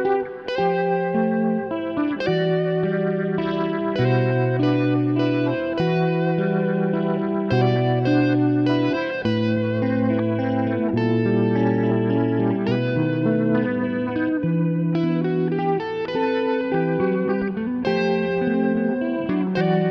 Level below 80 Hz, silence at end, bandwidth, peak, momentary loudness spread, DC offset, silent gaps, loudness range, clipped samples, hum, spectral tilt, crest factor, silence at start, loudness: -56 dBFS; 0 s; 6.2 kHz; -8 dBFS; 4 LU; under 0.1%; none; 2 LU; under 0.1%; none; -9 dB/octave; 12 dB; 0 s; -21 LUFS